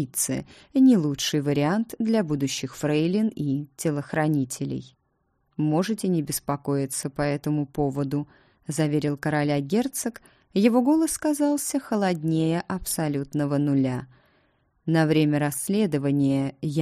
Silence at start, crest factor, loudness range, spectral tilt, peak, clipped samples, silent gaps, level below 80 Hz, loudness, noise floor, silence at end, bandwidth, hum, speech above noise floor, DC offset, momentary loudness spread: 0 s; 18 dB; 4 LU; -5.5 dB/octave; -8 dBFS; under 0.1%; none; -56 dBFS; -25 LUFS; -71 dBFS; 0 s; 15.5 kHz; none; 47 dB; under 0.1%; 8 LU